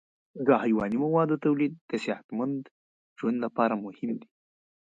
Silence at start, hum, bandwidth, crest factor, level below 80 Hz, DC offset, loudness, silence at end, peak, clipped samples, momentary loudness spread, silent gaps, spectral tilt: 0.35 s; none; 7.8 kHz; 20 dB; -68 dBFS; under 0.1%; -28 LUFS; 0.6 s; -8 dBFS; under 0.1%; 10 LU; 1.81-1.89 s, 2.24-2.29 s, 2.71-3.16 s; -8 dB/octave